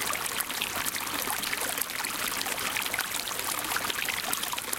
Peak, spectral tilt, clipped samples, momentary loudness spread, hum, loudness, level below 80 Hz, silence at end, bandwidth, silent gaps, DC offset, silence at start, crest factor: -4 dBFS; 0 dB/octave; under 0.1%; 1 LU; none; -29 LUFS; -60 dBFS; 0 s; 17 kHz; none; under 0.1%; 0 s; 26 dB